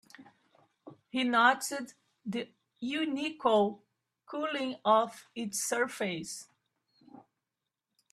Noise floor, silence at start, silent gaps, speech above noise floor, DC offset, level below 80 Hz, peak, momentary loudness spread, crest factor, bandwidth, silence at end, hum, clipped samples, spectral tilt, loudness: -88 dBFS; 0.2 s; none; 58 dB; under 0.1%; -80 dBFS; -10 dBFS; 17 LU; 22 dB; 14.5 kHz; 1.7 s; none; under 0.1%; -3 dB/octave; -31 LUFS